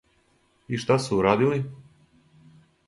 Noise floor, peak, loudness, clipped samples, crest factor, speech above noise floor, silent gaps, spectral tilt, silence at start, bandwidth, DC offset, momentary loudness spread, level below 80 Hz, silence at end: -65 dBFS; -6 dBFS; -24 LUFS; under 0.1%; 22 dB; 42 dB; none; -6.5 dB/octave; 0.7 s; 11.5 kHz; under 0.1%; 12 LU; -56 dBFS; 1.05 s